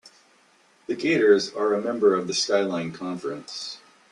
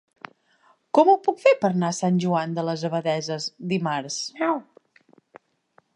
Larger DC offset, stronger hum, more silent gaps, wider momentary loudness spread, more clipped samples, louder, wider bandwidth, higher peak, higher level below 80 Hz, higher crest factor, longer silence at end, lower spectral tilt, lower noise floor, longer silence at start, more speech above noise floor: neither; neither; neither; first, 15 LU vs 11 LU; neither; about the same, -24 LUFS vs -23 LUFS; about the same, 11 kHz vs 11 kHz; about the same, -6 dBFS vs -4 dBFS; about the same, -70 dBFS vs -74 dBFS; about the same, 18 dB vs 20 dB; second, 0.35 s vs 1.35 s; second, -4 dB/octave vs -5.5 dB/octave; about the same, -60 dBFS vs -63 dBFS; second, 0.05 s vs 0.95 s; second, 36 dB vs 40 dB